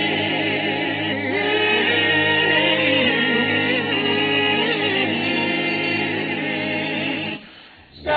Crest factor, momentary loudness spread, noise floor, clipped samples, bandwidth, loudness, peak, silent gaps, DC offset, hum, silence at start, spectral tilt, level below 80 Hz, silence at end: 14 dB; 7 LU; -45 dBFS; under 0.1%; 4.9 kHz; -19 LUFS; -6 dBFS; none; under 0.1%; none; 0 s; -7 dB/octave; -58 dBFS; 0 s